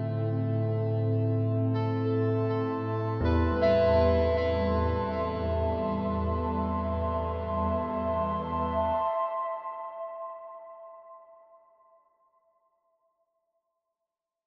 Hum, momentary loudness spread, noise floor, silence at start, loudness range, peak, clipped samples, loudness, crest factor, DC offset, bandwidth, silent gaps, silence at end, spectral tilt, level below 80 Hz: none; 14 LU; -88 dBFS; 0 s; 12 LU; -12 dBFS; under 0.1%; -29 LUFS; 18 dB; under 0.1%; 5.8 kHz; none; 3.15 s; -10 dB/octave; -42 dBFS